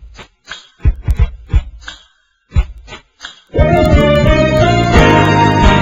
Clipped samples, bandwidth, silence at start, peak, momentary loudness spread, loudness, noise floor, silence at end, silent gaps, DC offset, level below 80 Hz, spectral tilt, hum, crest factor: 0.1%; 10.5 kHz; 0 s; 0 dBFS; 22 LU; -12 LUFS; -52 dBFS; 0 s; none; under 0.1%; -18 dBFS; -6.5 dB/octave; none; 12 dB